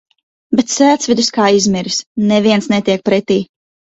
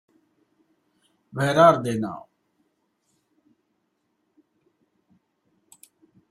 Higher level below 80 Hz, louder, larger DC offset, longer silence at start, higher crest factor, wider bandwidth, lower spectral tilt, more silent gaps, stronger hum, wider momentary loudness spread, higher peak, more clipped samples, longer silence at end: first, -54 dBFS vs -66 dBFS; first, -13 LUFS vs -20 LUFS; neither; second, 0.5 s vs 1.35 s; second, 14 dB vs 24 dB; second, 8 kHz vs 13 kHz; second, -4 dB/octave vs -6 dB/octave; first, 2.06-2.15 s vs none; neither; second, 6 LU vs 21 LU; first, 0 dBFS vs -4 dBFS; neither; second, 0.5 s vs 4.1 s